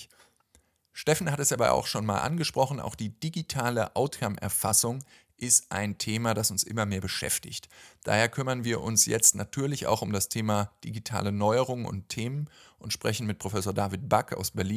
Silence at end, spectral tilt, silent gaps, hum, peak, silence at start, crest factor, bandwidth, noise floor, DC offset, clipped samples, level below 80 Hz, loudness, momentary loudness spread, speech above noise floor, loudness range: 0 s; -3.5 dB/octave; none; none; -4 dBFS; 0 s; 24 dB; 16 kHz; -66 dBFS; under 0.1%; under 0.1%; -54 dBFS; -27 LUFS; 12 LU; 38 dB; 5 LU